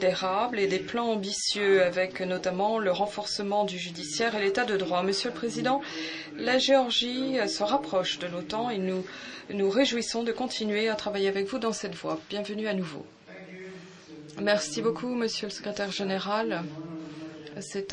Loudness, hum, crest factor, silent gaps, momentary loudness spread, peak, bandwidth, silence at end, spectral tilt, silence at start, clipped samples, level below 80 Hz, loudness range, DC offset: -28 LUFS; none; 18 dB; none; 15 LU; -10 dBFS; 10.5 kHz; 0 s; -3.5 dB/octave; 0 s; under 0.1%; -68 dBFS; 5 LU; under 0.1%